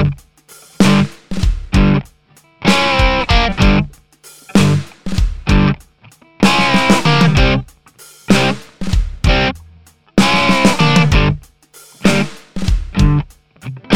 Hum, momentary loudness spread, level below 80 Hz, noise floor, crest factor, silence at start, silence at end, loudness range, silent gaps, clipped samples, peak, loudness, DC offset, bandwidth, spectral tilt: none; 12 LU; -22 dBFS; -50 dBFS; 14 dB; 0 s; 0 s; 2 LU; none; under 0.1%; 0 dBFS; -14 LUFS; 2%; 15.5 kHz; -5.5 dB/octave